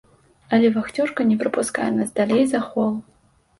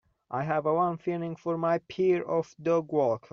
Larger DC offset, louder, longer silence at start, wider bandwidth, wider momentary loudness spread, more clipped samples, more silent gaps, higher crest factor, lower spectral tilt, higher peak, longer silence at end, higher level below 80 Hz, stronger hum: neither; first, -21 LUFS vs -29 LUFS; first, 0.5 s vs 0.3 s; first, 11.5 kHz vs 7 kHz; about the same, 5 LU vs 7 LU; neither; neither; about the same, 16 dB vs 14 dB; about the same, -5.5 dB/octave vs -6.5 dB/octave; first, -4 dBFS vs -14 dBFS; first, 0.6 s vs 0.15 s; first, -60 dBFS vs -70 dBFS; neither